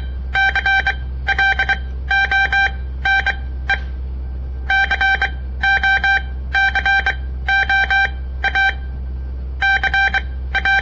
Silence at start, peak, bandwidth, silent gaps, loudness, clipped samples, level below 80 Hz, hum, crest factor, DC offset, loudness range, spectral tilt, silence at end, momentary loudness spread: 0 s; -6 dBFS; 7.4 kHz; none; -16 LUFS; under 0.1%; -26 dBFS; none; 12 dB; 0.1%; 2 LU; -4 dB/octave; 0 s; 14 LU